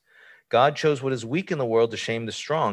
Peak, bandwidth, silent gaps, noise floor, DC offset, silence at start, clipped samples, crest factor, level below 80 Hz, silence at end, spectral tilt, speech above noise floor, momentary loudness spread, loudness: -6 dBFS; 11 kHz; none; -54 dBFS; under 0.1%; 0.5 s; under 0.1%; 18 dB; -66 dBFS; 0 s; -5 dB/octave; 31 dB; 7 LU; -24 LUFS